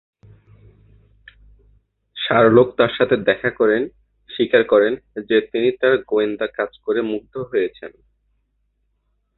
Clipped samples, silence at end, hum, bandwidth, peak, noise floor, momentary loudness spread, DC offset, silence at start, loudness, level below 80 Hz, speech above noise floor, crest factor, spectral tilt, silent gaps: under 0.1%; 1.5 s; none; 4.3 kHz; -2 dBFS; -68 dBFS; 13 LU; under 0.1%; 2.15 s; -18 LUFS; -56 dBFS; 50 dB; 18 dB; -10 dB/octave; none